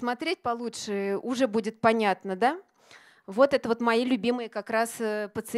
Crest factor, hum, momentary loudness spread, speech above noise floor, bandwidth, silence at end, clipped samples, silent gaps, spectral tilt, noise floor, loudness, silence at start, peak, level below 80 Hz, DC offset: 20 dB; none; 9 LU; 28 dB; 15.5 kHz; 0 s; under 0.1%; none; -4.5 dB/octave; -55 dBFS; -27 LUFS; 0 s; -6 dBFS; -68 dBFS; under 0.1%